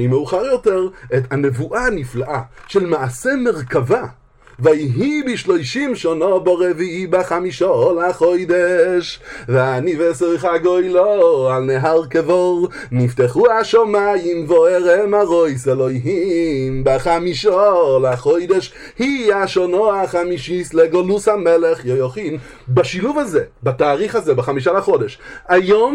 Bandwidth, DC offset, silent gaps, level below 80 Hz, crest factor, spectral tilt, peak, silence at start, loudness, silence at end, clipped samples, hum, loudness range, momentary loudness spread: 12 kHz; under 0.1%; none; -44 dBFS; 16 dB; -6.5 dB/octave; 0 dBFS; 0 s; -16 LUFS; 0 s; under 0.1%; none; 4 LU; 7 LU